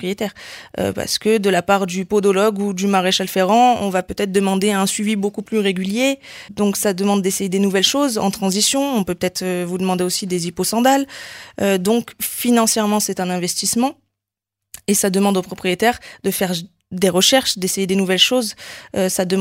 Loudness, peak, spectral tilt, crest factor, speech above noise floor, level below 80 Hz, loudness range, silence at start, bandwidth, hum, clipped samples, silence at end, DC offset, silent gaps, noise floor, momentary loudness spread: -18 LUFS; 0 dBFS; -3.5 dB/octave; 18 dB; 65 dB; -54 dBFS; 3 LU; 0 s; 16.5 kHz; none; under 0.1%; 0 s; under 0.1%; none; -83 dBFS; 10 LU